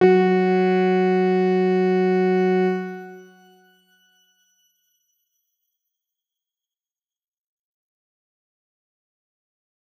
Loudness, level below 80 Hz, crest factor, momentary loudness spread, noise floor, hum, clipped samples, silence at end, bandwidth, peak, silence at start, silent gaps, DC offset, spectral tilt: -19 LUFS; -78 dBFS; 18 dB; 11 LU; under -90 dBFS; none; under 0.1%; 6.8 s; 6.6 kHz; -4 dBFS; 0 s; none; under 0.1%; -8.5 dB/octave